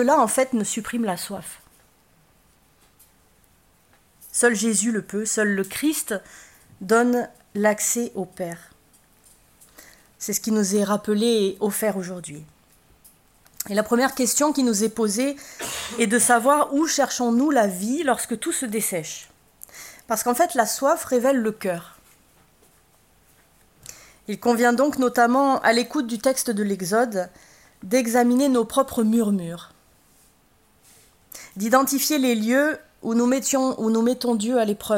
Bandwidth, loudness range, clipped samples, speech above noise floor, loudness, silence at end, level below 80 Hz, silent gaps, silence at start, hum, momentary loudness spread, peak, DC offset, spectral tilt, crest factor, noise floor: 16.5 kHz; 7 LU; under 0.1%; 38 dB; -22 LUFS; 0 s; -62 dBFS; none; 0 s; none; 16 LU; -4 dBFS; under 0.1%; -3.5 dB/octave; 20 dB; -60 dBFS